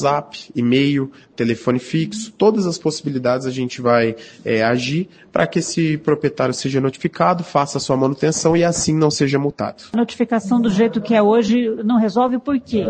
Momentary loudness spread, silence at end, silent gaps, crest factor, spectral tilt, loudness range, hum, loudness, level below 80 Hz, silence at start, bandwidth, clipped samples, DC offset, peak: 7 LU; 0 s; none; 18 dB; -5.5 dB/octave; 2 LU; none; -18 LUFS; -54 dBFS; 0 s; 9.6 kHz; under 0.1%; under 0.1%; 0 dBFS